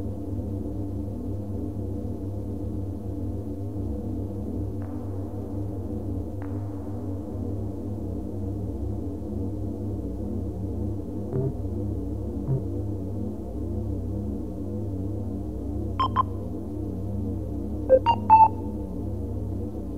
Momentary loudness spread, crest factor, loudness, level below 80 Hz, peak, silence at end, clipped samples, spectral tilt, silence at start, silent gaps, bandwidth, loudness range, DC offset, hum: 8 LU; 22 dB; -29 LUFS; -38 dBFS; -6 dBFS; 0 s; under 0.1%; -9 dB/octave; 0 s; none; 6.8 kHz; 9 LU; 0.9%; none